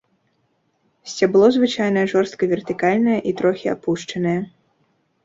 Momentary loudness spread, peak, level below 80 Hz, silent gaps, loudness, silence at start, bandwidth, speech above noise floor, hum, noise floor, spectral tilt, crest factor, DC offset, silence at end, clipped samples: 10 LU; -2 dBFS; -62 dBFS; none; -19 LUFS; 1.05 s; 7.8 kHz; 48 dB; none; -66 dBFS; -6 dB/octave; 18 dB; under 0.1%; 0.75 s; under 0.1%